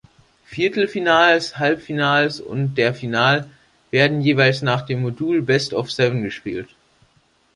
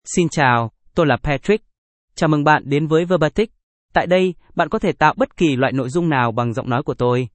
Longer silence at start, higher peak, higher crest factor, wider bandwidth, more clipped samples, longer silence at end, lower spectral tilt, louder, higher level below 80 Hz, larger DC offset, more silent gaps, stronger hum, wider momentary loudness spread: first, 0.5 s vs 0.05 s; about the same, -2 dBFS vs 0 dBFS; about the same, 18 dB vs 18 dB; first, 11 kHz vs 8.8 kHz; neither; first, 0.9 s vs 0.05 s; about the same, -5.5 dB/octave vs -6 dB/octave; about the same, -19 LUFS vs -18 LUFS; second, -58 dBFS vs -42 dBFS; neither; second, none vs 1.78-2.08 s, 3.63-3.89 s; neither; first, 9 LU vs 6 LU